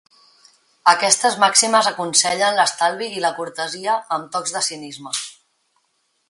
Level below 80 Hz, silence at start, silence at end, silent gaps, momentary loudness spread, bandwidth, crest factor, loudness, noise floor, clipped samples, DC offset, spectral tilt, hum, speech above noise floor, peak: -72 dBFS; 0.85 s; 1 s; none; 12 LU; 11.5 kHz; 20 dB; -18 LUFS; -68 dBFS; under 0.1%; under 0.1%; -0.5 dB/octave; none; 49 dB; 0 dBFS